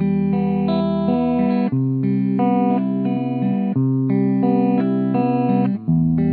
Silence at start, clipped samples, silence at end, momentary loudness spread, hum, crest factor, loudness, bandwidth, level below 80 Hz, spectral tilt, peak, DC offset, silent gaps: 0 s; under 0.1%; 0 s; 3 LU; none; 12 dB; -19 LUFS; 4.5 kHz; -52 dBFS; -12.5 dB/octave; -6 dBFS; under 0.1%; none